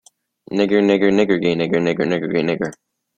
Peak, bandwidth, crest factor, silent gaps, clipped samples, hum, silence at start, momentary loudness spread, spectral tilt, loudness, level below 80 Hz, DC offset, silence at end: -2 dBFS; 9 kHz; 16 dB; none; under 0.1%; none; 0.5 s; 8 LU; -6.5 dB/octave; -18 LUFS; -56 dBFS; under 0.1%; 0.45 s